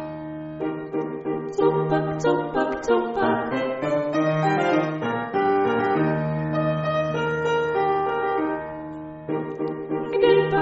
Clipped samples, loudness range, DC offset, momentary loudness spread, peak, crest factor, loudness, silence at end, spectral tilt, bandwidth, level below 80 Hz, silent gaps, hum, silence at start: under 0.1%; 2 LU; under 0.1%; 9 LU; -6 dBFS; 16 dB; -23 LUFS; 0 s; -5.5 dB/octave; 8 kHz; -54 dBFS; none; none; 0 s